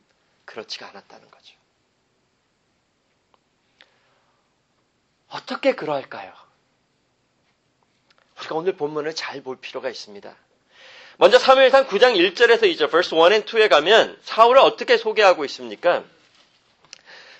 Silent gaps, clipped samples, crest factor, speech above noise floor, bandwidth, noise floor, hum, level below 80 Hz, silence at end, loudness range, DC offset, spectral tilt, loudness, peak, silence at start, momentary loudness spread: none; under 0.1%; 20 dB; 49 dB; 8.4 kHz; -68 dBFS; none; -68 dBFS; 1.35 s; 15 LU; under 0.1%; -3 dB/octave; -17 LUFS; 0 dBFS; 0.55 s; 21 LU